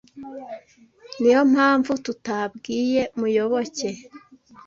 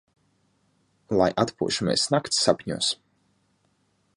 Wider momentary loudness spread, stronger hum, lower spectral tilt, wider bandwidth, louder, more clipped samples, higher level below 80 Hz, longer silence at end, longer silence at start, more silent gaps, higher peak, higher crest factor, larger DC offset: first, 22 LU vs 4 LU; neither; about the same, -4.5 dB/octave vs -3.5 dB/octave; second, 7.6 kHz vs 11.5 kHz; first, -21 LUFS vs -24 LUFS; neither; second, -64 dBFS vs -58 dBFS; second, 0.5 s vs 1.2 s; second, 0.15 s vs 1.1 s; neither; about the same, -6 dBFS vs -4 dBFS; about the same, 18 dB vs 22 dB; neither